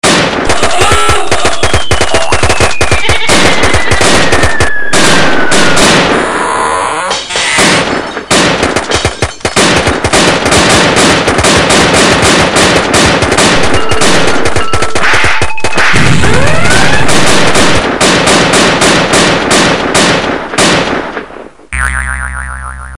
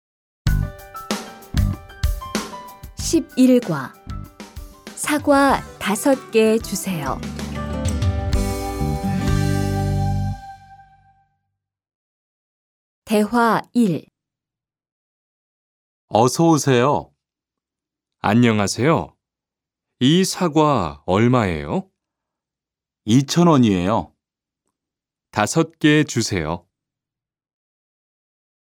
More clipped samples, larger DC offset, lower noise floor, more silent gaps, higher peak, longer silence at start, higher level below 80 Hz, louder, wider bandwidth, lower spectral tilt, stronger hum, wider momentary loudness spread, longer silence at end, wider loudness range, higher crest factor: first, 3% vs under 0.1%; neither; second, -28 dBFS vs -89 dBFS; second, none vs 11.95-13.02 s, 14.92-16.08 s; about the same, 0 dBFS vs 0 dBFS; second, 0 s vs 0.45 s; first, -24 dBFS vs -34 dBFS; first, -7 LUFS vs -19 LUFS; second, 16 kHz vs 18 kHz; second, -3 dB/octave vs -5.5 dB/octave; neither; second, 7 LU vs 13 LU; second, 0 s vs 2.15 s; about the same, 3 LU vs 5 LU; second, 8 dB vs 20 dB